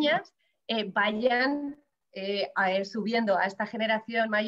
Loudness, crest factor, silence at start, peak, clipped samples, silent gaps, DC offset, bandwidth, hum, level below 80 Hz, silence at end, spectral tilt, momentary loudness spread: -28 LUFS; 16 dB; 0 s; -12 dBFS; under 0.1%; none; under 0.1%; 8 kHz; none; -76 dBFS; 0 s; -5.5 dB/octave; 8 LU